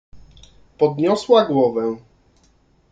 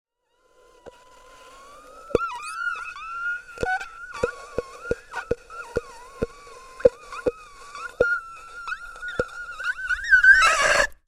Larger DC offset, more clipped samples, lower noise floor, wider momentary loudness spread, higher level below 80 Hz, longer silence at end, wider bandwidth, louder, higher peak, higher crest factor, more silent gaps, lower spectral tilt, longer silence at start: neither; neither; second, -58 dBFS vs -66 dBFS; second, 11 LU vs 20 LU; second, -54 dBFS vs -46 dBFS; first, 0.95 s vs 0.15 s; second, 9 kHz vs 15.5 kHz; first, -18 LUFS vs -23 LUFS; about the same, -2 dBFS vs -2 dBFS; second, 18 dB vs 24 dB; neither; first, -6.5 dB/octave vs -2.5 dB/octave; second, 0.15 s vs 0.85 s